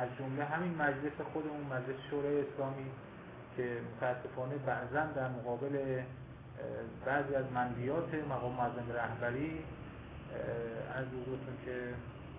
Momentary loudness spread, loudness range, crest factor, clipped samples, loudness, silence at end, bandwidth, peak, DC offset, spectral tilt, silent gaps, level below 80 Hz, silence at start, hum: 11 LU; 3 LU; 18 dB; under 0.1%; -39 LUFS; 0 s; 3.9 kHz; -20 dBFS; under 0.1%; -6 dB/octave; none; -60 dBFS; 0 s; none